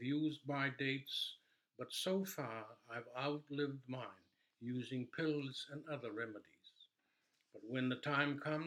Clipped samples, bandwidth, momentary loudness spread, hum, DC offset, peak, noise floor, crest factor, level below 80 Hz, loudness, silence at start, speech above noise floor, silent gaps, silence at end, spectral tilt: under 0.1%; 17 kHz; 12 LU; none; under 0.1%; -20 dBFS; -83 dBFS; 24 dB; under -90 dBFS; -42 LUFS; 0 s; 41 dB; none; 0 s; -5 dB/octave